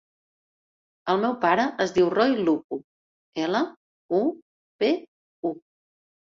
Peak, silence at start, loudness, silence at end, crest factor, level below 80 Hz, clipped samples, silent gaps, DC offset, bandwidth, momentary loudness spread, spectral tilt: -8 dBFS; 1.05 s; -25 LUFS; 0.75 s; 20 dB; -66 dBFS; under 0.1%; 2.64-2.69 s, 2.84-3.32 s, 3.77-4.09 s, 4.42-4.79 s, 5.08-5.43 s; under 0.1%; 7.4 kHz; 14 LU; -5.5 dB/octave